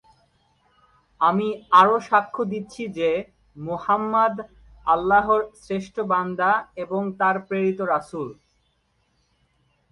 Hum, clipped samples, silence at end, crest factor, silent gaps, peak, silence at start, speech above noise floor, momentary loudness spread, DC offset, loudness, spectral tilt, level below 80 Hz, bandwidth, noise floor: none; under 0.1%; 1.6 s; 20 dB; none; -2 dBFS; 1.2 s; 46 dB; 15 LU; under 0.1%; -22 LUFS; -6.5 dB/octave; -58 dBFS; 11 kHz; -68 dBFS